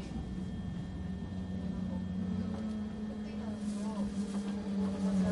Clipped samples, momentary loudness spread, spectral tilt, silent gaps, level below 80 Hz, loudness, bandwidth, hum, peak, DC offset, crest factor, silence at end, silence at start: under 0.1%; 6 LU; -7.5 dB/octave; none; -50 dBFS; -38 LUFS; 11.5 kHz; none; -22 dBFS; under 0.1%; 14 dB; 0 s; 0 s